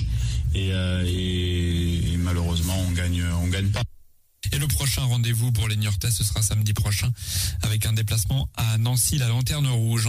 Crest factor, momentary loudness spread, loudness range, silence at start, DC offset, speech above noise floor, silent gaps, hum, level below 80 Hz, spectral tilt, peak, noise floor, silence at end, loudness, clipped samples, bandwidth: 12 dB; 3 LU; 2 LU; 0 s; under 0.1%; 28 dB; none; none; -34 dBFS; -4.5 dB/octave; -10 dBFS; -51 dBFS; 0 s; -24 LUFS; under 0.1%; 16 kHz